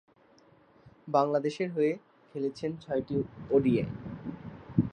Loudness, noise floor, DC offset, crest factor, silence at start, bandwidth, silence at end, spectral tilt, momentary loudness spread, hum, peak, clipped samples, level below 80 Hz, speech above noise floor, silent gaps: -31 LUFS; -61 dBFS; under 0.1%; 22 dB; 0.85 s; 9.4 kHz; 0 s; -8 dB/octave; 15 LU; none; -10 dBFS; under 0.1%; -60 dBFS; 32 dB; none